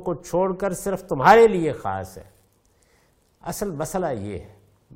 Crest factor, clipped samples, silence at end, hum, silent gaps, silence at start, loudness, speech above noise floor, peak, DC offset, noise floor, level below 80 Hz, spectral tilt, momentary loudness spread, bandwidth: 22 dB; under 0.1%; 0.55 s; none; none; 0 s; -21 LUFS; 40 dB; 0 dBFS; under 0.1%; -62 dBFS; -50 dBFS; -5.5 dB/octave; 20 LU; 16.5 kHz